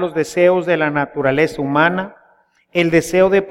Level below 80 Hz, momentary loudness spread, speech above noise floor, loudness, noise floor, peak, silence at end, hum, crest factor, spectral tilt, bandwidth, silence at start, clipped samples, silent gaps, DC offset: -48 dBFS; 6 LU; 40 dB; -16 LUFS; -55 dBFS; -2 dBFS; 0 s; none; 16 dB; -5.5 dB/octave; 15.5 kHz; 0 s; under 0.1%; none; under 0.1%